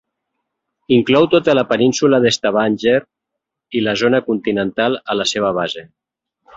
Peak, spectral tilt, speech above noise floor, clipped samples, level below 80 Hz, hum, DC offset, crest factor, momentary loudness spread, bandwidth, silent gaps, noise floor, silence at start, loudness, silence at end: 0 dBFS; -4.5 dB/octave; 65 dB; under 0.1%; -56 dBFS; none; under 0.1%; 16 dB; 7 LU; 8 kHz; none; -80 dBFS; 0.9 s; -16 LUFS; 0.7 s